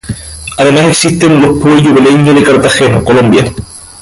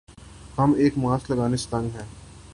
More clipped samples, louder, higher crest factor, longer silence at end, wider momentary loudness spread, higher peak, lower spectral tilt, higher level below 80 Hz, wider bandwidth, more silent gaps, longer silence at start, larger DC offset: first, 0.1% vs under 0.1%; first, -6 LUFS vs -24 LUFS; second, 6 dB vs 16 dB; first, 0.15 s vs 0 s; about the same, 15 LU vs 16 LU; first, 0 dBFS vs -8 dBFS; second, -5 dB/octave vs -7 dB/octave; first, -32 dBFS vs -46 dBFS; about the same, 11.5 kHz vs 11.5 kHz; neither; second, 0.05 s vs 0.2 s; neither